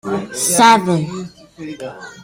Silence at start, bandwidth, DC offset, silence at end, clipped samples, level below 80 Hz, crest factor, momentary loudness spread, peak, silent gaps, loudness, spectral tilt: 0.05 s; 16.5 kHz; under 0.1%; 0 s; under 0.1%; -56 dBFS; 16 dB; 22 LU; 0 dBFS; none; -13 LUFS; -3.5 dB/octave